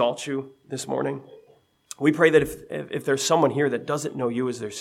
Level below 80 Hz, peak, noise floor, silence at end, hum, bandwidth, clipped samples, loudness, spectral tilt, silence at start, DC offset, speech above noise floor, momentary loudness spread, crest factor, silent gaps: -58 dBFS; -4 dBFS; -58 dBFS; 0 s; none; 15.5 kHz; under 0.1%; -24 LUFS; -4.5 dB/octave; 0 s; under 0.1%; 34 dB; 15 LU; 20 dB; none